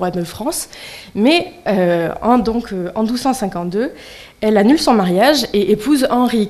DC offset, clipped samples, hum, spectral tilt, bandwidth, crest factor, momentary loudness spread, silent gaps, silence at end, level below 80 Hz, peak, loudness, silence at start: under 0.1%; under 0.1%; none; -5 dB/octave; 15 kHz; 16 dB; 11 LU; none; 0 s; -44 dBFS; 0 dBFS; -16 LUFS; 0 s